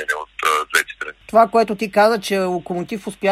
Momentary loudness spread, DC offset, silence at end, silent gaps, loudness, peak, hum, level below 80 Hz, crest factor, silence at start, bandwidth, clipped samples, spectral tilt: 11 LU; under 0.1%; 0 s; none; -18 LUFS; 0 dBFS; none; -56 dBFS; 18 dB; 0 s; 15.5 kHz; under 0.1%; -4 dB/octave